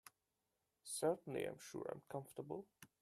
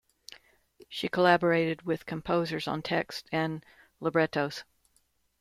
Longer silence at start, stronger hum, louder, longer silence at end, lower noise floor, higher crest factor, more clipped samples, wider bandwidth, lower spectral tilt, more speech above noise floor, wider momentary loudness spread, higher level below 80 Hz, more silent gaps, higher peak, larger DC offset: second, 0.05 s vs 0.9 s; neither; second, -46 LUFS vs -29 LUFS; second, 0.15 s vs 0.8 s; first, -89 dBFS vs -71 dBFS; about the same, 20 dB vs 20 dB; neither; about the same, 15 kHz vs 15 kHz; second, -4.5 dB/octave vs -6 dB/octave; about the same, 43 dB vs 42 dB; about the same, 18 LU vs 18 LU; second, -84 dBFS vs -64 dBFS; neither; second, -26 dBFS vs -10 dBFS; neither